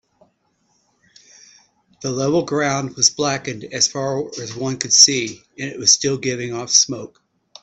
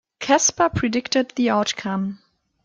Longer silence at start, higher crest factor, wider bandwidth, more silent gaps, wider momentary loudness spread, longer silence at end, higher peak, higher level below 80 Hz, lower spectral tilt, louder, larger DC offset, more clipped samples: first, 2 s vs 0.2 s; about the same, 20 dB vs 18 dB; first, 16 kHz vs 10.5 kHz; neither; first, 17 LU vs 8 LU; about the same, 0.55 s vs 0.5 s; first, 0 dBFS vs -4 dBFS; second, -60 dBFS vs -52 dBFS; second, -2 dB/octave vs -3.5 dB/octave; first, -17 LUFS vs -21 LUFS; neither; neither